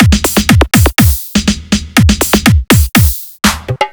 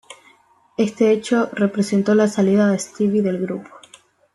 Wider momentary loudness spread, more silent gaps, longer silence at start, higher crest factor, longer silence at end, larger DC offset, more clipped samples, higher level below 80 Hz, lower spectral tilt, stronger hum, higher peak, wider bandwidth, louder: second, 6 LU vs 9 LU; neither; about the same, 0 s vs 0.1 s; second, 10 dB vs 16 dB; second, 0 s vs 0.7 s; neither; first, 1% vs under 0.1%; first, -16 dBFS vs -64 dBFS; second, -4.5 dB/octave vs -6.5 dB/octave; neither; first, 0 dBFS vs -4 dBFS; first, over 20 kHz vs 12 kHz; first, -10 LUFS vs -19 LUFS